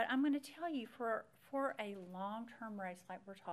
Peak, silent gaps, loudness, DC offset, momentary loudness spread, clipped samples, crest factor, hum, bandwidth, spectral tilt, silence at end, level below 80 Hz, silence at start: -24 dBFS; none; -43 LUFS; under 0.1%; 11 LU; under 0.1%; 18 dB; none; 13.5 kHz; -5.5 dB/octave; 0 s; -90 dBFS; 0 s